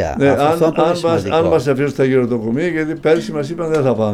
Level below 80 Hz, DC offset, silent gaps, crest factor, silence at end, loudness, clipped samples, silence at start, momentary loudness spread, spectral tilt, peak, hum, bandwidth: -42 dBFS; under 0.1%; none; 14 dB; 0 s; -16 LUFS; under 0.1%; 0 s; 5 LU; -7 dB/octave; -2 dBFS; none; 14.5 kHz